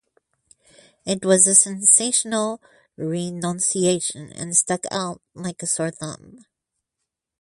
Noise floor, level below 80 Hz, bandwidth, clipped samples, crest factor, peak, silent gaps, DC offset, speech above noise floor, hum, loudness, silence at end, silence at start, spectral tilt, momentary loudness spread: -82 dBFS; -64 dBFS; 11.5 kHz; under 0.1%; 22 dB; 0 dBFS; none; under 0.1%; 60 dB; none; -19 LUFS; 1.05 s; 1.05 s; -3 dB/octave; 19 LU